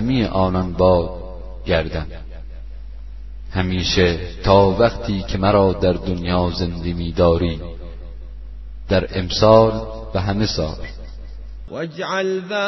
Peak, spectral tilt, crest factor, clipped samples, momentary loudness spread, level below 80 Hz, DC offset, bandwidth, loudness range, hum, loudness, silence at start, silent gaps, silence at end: 0 dBFS; -6.5 dB/octave; 20 dB; under 0.1%; 23 LU; -32 dBFS; 1%; 6.2 kHz; 5 LU; none; -19 LUFS; 0 s; none; 0 s